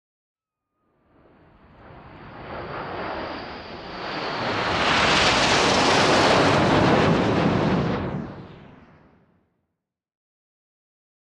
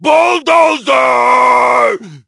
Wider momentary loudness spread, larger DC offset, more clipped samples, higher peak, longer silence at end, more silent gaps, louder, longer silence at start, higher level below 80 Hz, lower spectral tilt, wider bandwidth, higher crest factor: first, 19 LU vs 3 LU; neither; second, under 0.1% vs 0.2%; second, -6 dBFS vs 0 dBFS; first, 2.7 s vs 0.1 s; neither; second, -20 LUFS vs -9 LUFS; first, 1.85 s vs 0 s; first, -46 dBFS vs -60 dBFS; first, -4.5 dB/octave vs -3 dB/octave; about the same, 12.5 kHz vs 11.5 kHz; first, 18 dB vs 10 dB